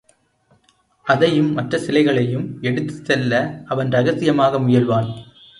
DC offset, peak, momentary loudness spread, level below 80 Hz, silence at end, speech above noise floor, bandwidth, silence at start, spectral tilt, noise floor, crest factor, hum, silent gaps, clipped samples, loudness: under 0.1%; -2 dBFS; 8 LU; -56 dBFS; 0.35 s; 42 dB; 11 kHz; 1.05 s; -7 dB/octave; -60 dBFS; 18 dB; none; none; under 0.1%; -18 LUFS